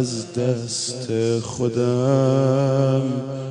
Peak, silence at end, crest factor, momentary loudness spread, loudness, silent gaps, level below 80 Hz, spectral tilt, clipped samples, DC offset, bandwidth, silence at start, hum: -6 dBFS; 0 s; 14 dB; 7 LU; -21 LUFS; none; -58 dBFS; -6 dB/octave; under 0.1%; under 0.1%; 10.5 kHz; 0 s; none